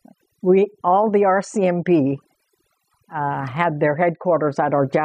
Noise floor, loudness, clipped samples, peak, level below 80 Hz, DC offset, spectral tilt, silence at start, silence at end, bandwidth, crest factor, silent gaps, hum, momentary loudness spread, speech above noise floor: -68 dBFS; -19 LUFS; under 0.1%; -4 dBFS; -68 dBFS; under 0.1%; -7.5 dB/octave; 0.45 s; 0 s; 9.8 kHz; 16 dB; none; none; 8 LU; 50 dB